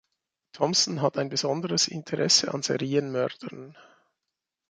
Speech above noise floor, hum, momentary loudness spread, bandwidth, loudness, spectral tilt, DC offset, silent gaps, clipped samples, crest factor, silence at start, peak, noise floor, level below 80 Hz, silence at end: 59 dB; none; 10 LU; 11 kHz; -25 LUFS; -3 dB/octave; under 0.1%; none; under 0.1%; 20 dB; 0.55 s; -8 dBFS; -86 dBFS; -72 dBFS; 0.9 s